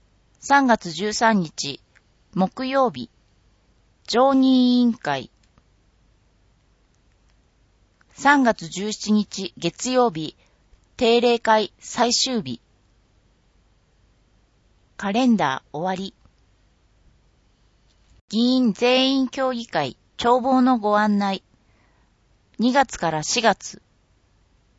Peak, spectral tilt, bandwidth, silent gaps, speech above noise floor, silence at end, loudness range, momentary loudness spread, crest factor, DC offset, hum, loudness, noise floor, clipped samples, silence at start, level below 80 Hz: -2 dBFS; -4 dB/octave; 8 kHz; 18.21-18.28 s; 41 dB; 1.05 s; 6 LU; 13 LU; 22 dB; under 0.1%; none; -21 LUFS; -61 dBFS; under 0.1%; 0.45 s; -58 dBFS